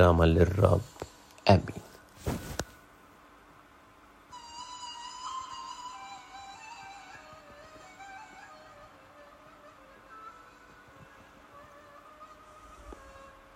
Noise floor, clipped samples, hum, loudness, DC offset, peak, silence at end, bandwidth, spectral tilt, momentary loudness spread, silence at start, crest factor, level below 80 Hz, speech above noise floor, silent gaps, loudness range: -57 dBFS; under 0.1%; none; -30 LUFS; under 0.1%; -6 dBFS; 0.6 s; 16 kHz; -6.5 dB/octave; 28 LU; 0 s; 26 dB; -50 dBFS; 34 dB; none; 21 LU